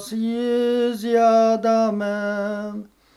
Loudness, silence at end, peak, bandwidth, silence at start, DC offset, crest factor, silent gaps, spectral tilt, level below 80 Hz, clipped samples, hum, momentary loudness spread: -20 LUFS; 0.3 s; -8 dBFS; 13 kHz; 0 s; under 0.1%; 14 dB; none; -5.5 dB/octave; -66 dBFS; under 0.1%; none; 12 LU